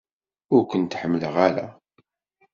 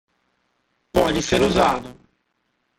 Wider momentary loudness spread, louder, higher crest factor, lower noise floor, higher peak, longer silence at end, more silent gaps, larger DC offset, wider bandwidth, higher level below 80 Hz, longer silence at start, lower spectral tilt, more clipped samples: about the same, 8 LU vs 10 LU; about the same, -22 LUFS vs -20 LUFS; about the same, 22 dB vs 20 dB; second, -67 dBFS vs -71 dBFS; about the same, -4 dBFS vs -4 dBFS; about the same, 0.8 s vs 0.85 s; neither; neither; second, 7.2 kHz vs 16.5 kHz; second, -66 dBFS vs -42 dBFS; second, 0.5 s vs 0.95 s; first, -6 dB/octave vs -4.5 dB/octave; neither